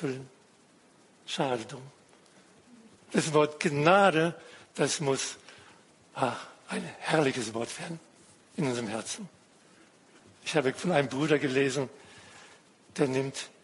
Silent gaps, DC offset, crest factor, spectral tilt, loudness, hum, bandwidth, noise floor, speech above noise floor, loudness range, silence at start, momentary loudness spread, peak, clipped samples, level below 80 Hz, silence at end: none; under 0.1%; 24 dB; -4.5 dB/octave; -29 LUFS; none; 11.5 kHz; -61 dBFS; 32 dB; 7 LU; 0 s; 20 LU; -8 dBFS; under 0.1%; -74 dBFS; 0.15 s